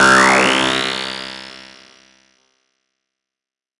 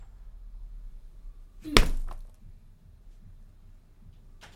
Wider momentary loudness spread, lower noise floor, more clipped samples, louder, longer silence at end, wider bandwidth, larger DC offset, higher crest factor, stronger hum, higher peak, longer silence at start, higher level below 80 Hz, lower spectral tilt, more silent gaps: second, 24 LU vs 28 LU; first, -89 dBFS vs -52 dBFS; neither; first, -14 LUFS vs -26 LUFS; first, 2.2 s vs 0.2 s; second, 11.5 kHz vs 16.5 kHz; neither; second, 18 dB vs 32 dB; neither; about the same, 0 dBFS vs 0 dBFS; about the same, 0 s vs 0 s; second, -52 dBFS vs -34 dBFS; about the same, -2.5 dB/octave vs -3.5 dB/octave; neither